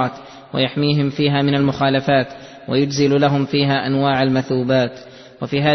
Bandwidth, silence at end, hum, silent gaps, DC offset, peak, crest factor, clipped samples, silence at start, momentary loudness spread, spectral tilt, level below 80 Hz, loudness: 6.4 kHz; 0 s; none; none; under 0.1%; -4 dBFS; 14 dB; under 0.1%; 0 s; 10 LU; -6.5 dB/octave; -52 dBFS; -18 LUFS